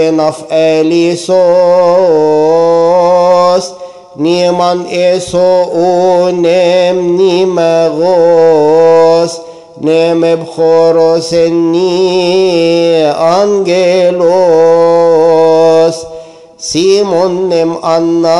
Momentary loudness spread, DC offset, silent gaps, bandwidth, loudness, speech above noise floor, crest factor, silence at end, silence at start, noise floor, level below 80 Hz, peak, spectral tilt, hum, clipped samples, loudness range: 5 LU; 0.3%; none; 11.5 kHz; -8 LUFS; 22 dB; 8 dB; 0 s; 0 s; -29 dBFS; -52 dBFS; 0 dBFS; -5.5 dB/octave; none; under 0.1%; 2 LU